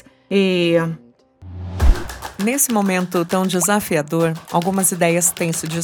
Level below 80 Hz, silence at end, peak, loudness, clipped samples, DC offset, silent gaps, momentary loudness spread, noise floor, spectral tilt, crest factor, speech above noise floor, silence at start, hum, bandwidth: -26 dBFS; 0 s; -2 dBFS; -18 LUFS; under 0.1%; under 0.1%; none; 10 LU; -41 dBFS; -4.5 dB/octave; 16 dB; 23 dB; 0.3 s; none; 19.5 kHz